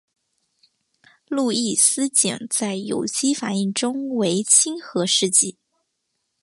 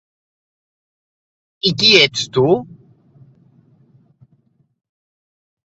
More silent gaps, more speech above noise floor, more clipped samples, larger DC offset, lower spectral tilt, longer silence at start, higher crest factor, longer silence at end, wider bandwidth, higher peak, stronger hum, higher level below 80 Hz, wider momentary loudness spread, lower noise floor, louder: neither; first, 54 dB vs 45 dB; neither; neither; about the same, -2.5 dB/octave vs -3.5 dB/octave; second, 1.3 s vs 1.65 s; about the same, 22 dB vs 22 dB; second, 0.9 s vs 3.15 s; first, 12 kHz vs 8 kHz; about the same, 0 dBFS vs 0 dBFS; neither; second, -70 dBFS vs -58 dBFS; about the same, 10 LU vs 10 LU; first, -75 dBFS vs -59 dBFS; second, -19 LUFS vs -13 LUFS